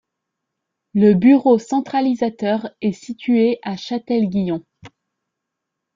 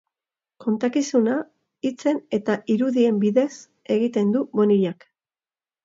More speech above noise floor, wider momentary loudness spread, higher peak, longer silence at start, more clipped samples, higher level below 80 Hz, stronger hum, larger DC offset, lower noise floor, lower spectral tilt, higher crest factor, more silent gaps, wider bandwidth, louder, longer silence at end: second, 63 dB vs over 69 dB; about the same, 12 LU vs 10 LU; first, -2 dBFS vs -6 dBFS; first, 0.95 s vs 0.6 s; neither; first, -60 dBFS vs -72 dBFS; neither; neither; second, -80 dBFS vs under -90 dBFS; about the same, -7.5 dB/octave vs -6.5 dB/octave; about the same, 16 dB vs 16 dB; neither; about the same, 7.6 kHz vs 7.8 kHz; first, -18 LUFS vs -22 LUFS; first, 1.1 s vs 0.9 s